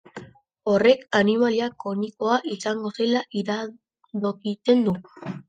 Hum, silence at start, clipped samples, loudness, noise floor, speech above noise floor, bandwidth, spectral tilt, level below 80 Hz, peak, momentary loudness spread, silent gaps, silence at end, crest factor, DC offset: none; 0.15 s; under 0.1%; -23 LUFS; -44 dBFS; 21 dB; 9.4 kHz; -5.5 dB/octave; -66 dBFS; -6 dBFS; 14 LU; none; 0.05 s; 18 dB; under 0.1%